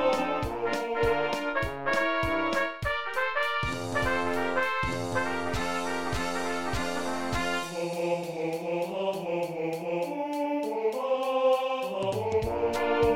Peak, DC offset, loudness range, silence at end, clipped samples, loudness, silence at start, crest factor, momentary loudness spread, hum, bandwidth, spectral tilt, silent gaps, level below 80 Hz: -14 dBFS; under 0.1%; 3 LU; 0 s; under 0.1%; -29 LUFS; 0 s; 16 dB; 5 LU; none; 17 kHz; -5 dB/octave; none; -48 dBFS